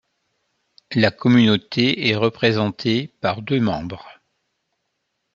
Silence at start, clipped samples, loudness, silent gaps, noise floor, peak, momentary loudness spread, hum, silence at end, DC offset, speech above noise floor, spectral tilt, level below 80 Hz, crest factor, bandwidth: 0.9 s; under 0.1%; -19 LUFS; none; -75 dBFS; 0 dBFS; 10 LU; none; 1.25 s; under 0.1%; 56 dB; -6.5 dB/octave; -58 dBFS; 20 dB; 7.2 kHz